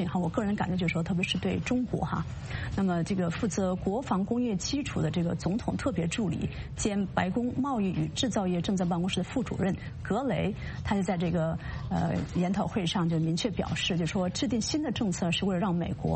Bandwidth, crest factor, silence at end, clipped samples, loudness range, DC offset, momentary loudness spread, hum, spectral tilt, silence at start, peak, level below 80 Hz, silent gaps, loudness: 8.8 kHz; 16 dB; 0 s; under 0.1%; 1 LU; under 0.1%; 3 LU; none; -5.5 dB/octave; 0 s; -14 dBFS; -46 dBFS; none; -30 LUFS